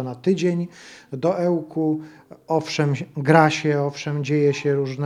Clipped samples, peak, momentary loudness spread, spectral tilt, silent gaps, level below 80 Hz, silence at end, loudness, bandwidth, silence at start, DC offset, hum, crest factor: under 0.1%; 0 dBFS; 10 LU; -6.5 dB/octave; none; -68 dBFS; 0 s; -21 LUFS; 11 kHz; 0 s; under 0.1%; none; 22 dB